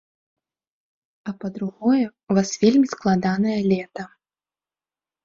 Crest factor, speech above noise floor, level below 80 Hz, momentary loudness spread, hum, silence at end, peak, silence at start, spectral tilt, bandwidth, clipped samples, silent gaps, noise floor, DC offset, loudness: 18 dB; over 69 dB; -62 dBFS; 17 LU; none; 1.2 s; -4 dBFS; 1.25 s; -6 dB/octave; 7.6 kHz; under 0.1%; none; under -90 dBFS; under 0.1%; -21 LUFS